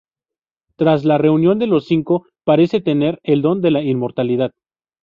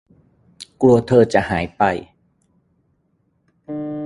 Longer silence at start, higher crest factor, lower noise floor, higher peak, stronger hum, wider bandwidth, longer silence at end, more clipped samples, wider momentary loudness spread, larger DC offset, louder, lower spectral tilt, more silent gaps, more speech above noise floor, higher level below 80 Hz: first, 0.8 s vs 0.6 s; second, 14 dB vs 20 dB; first, -89 dBFS vs -65 dBFS; about the same, -2 dBFS vs 0 dBFS; neither; second, 6.6 kHz vs 11.5 kHz; first, 0.55 s vs 0 s; neither; second, 5 LU vs 19 LU; neither; about the same, -16 LUFS vs -17 LUFS; first, -9.5 dB/octave vs -7 dB/octave; neither; first, 74 dB vs 49 dB; second, -58 dBFS vs -46 dBFS